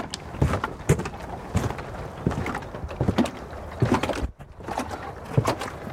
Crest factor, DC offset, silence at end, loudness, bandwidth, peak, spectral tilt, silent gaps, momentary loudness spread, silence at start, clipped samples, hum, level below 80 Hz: 22 dB; under 0.1%; 0 s; -28 LUFS; 16.5 kHz; -6 dBFS; -6 dB/octave; none; 11 LU; 0 s; under 0.1%; none; -40 dBFS